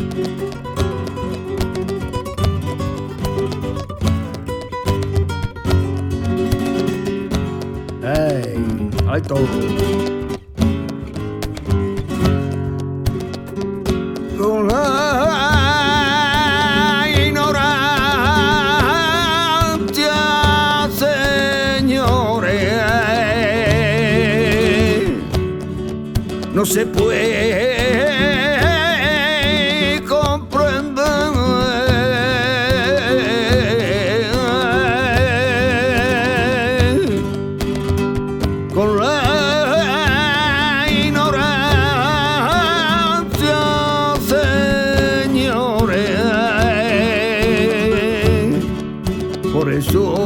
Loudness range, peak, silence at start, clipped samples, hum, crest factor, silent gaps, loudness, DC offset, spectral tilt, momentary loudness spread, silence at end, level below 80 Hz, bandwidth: 7 LU; -2 dBFS; 0 s; under 0.1%; none; 16 dB; none; -16 LUFS; under 0.1%; -5 dB/octave; 9 LU; 0 s; -32 dBFS; 19 kHz